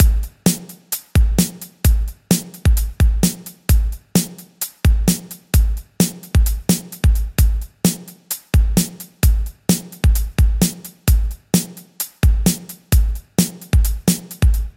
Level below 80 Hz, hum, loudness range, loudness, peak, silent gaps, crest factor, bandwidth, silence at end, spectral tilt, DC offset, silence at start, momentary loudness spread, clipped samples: -18 dBFS; none; 1 LU; -19 LUFS; 0 dBFS; none; 16 dB; 16.5 kHz; 0.05 s; -5 dB/octave; under 0.1%; 0 s; 8 LU; under 0.1%